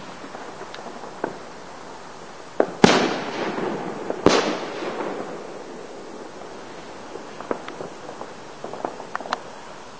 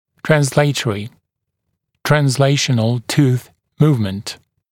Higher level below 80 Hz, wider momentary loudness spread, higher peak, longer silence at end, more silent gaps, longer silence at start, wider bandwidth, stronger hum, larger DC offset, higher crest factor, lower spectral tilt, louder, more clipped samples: about the same, -56 dBFS vs -52 dBFS; first, 20 LU vs 13 LU; about the same, 0 dBFS vs 0 dBFS; second, 0 s vs 0.35 s; neither; second, 0 s vs 0.25 s; second, 8 kHz vs 16.5 kHz; neither; first, 0.6% vs under 0.1%; first, 26 dB vs 18 dB; about the same, -4.5 dB/octave vs -5.5 dB/octave; second, -25 LUFS vs -16 LUFS; neither